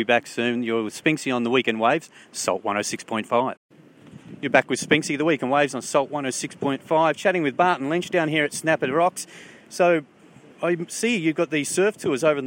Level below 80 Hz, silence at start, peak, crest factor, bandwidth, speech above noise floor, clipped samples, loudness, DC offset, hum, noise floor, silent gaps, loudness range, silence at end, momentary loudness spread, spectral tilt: -72 dBFS; 0 s; -2 dBFS; 22 dB; 16.5 kHz; 27 dB; under 0.1%; -23 LUFS; under 0.1%; none; -49 dBFS; 3.57-3.69 s; 2 LU; 0 s; 7 LU; -4 dB/octave